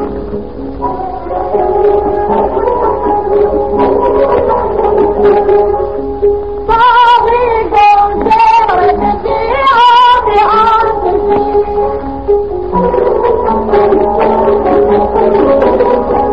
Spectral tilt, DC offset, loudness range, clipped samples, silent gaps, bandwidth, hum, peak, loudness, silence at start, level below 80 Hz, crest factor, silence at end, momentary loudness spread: -7 dB/octave; 3%; 4 LU; under 0.1%; none; 6.8 kHz; none; 0 dBFS; -9 LUFS; 0 s; -28 dBFS; 8 dB; 0 s; 8 LU